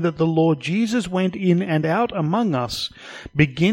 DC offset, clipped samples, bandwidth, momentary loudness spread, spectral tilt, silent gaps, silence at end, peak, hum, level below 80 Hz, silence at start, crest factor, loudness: under 0.1%; under 0.1%; 16 kHz; 8 LU; -6.5 dB/octave; none; 0 s; -2 dBFS; none; -50 dBFS; 0 s; 18 dB; -21 LUFS